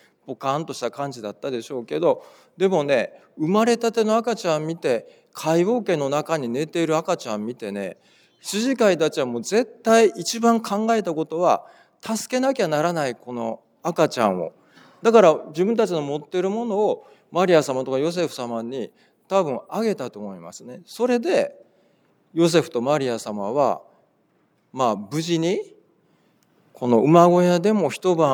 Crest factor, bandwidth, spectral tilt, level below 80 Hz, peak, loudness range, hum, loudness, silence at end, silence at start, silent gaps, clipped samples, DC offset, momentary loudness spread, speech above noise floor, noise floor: 20 dB; 20 kHz; -5.5 dB/octave; -80 dBFS; -2 dBFS; 5 LU; none; -22 LUFS; 0 s; 0.25 s; none; under 0.1%; under 0.1%; 13 LU; 43 dB; -64 dBFS